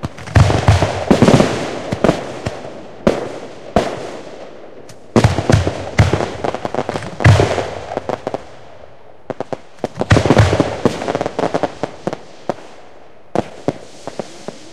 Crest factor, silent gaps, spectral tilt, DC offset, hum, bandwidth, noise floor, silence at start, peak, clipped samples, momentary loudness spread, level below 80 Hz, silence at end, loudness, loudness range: 18 dB; none; -6.5 dB/octave; 2%; none; 12 kHz; -43 dBFS; 0 s; 0 dBFS; under 0.1%; 18 LU; -32 dBFS; 0 s; -17 LUFS; 6 LU